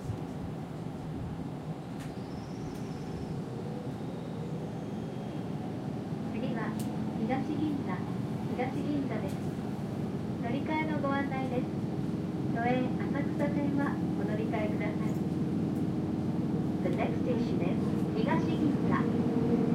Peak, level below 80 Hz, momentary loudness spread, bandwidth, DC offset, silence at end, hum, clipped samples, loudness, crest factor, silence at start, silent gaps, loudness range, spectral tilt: -16 dBFS; -56 dBFS; 9 LU; 15 kHz; under 0.1%; 0 s; none; under 0.1%; -33 LUFS; 16 dB; 0 s; none; 8 LU; -8 dB/octave